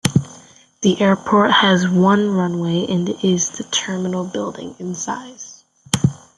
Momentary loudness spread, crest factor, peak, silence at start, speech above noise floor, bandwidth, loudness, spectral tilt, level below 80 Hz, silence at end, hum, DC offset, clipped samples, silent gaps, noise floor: 15 LU; 18 dB; 0 dBFS; 0.05 s; 28 dB; 12 kHz; -18 LUFS; -4.5 dB/octave; -52 dBFS; 0.2 s; none; under 0.1%; under 0.1%; none; -46 dBFS